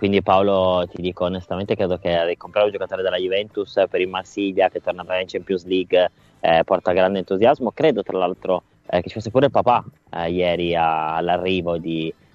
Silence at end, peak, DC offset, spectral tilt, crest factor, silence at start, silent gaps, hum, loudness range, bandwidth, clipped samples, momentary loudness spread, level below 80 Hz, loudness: 0.2 s; -2 dBFS; under 0.1%; -7 dB/octave; 18 dB; 0 s; none; none; 3 LU; 7.6 kHz; under 0.1%; 8 LU; -54 dBFS; -21 LUFS